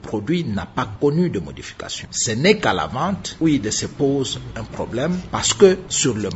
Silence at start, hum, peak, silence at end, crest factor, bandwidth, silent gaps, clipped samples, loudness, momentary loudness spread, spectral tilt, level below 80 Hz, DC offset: 0 s; none; 0 dBFS; 0 s; 20 dB; 8.2 kHz; none; under 0.1%; -20 LUFS; 14 LU; -4 dB/octave; -44 dBFS; under 0.1%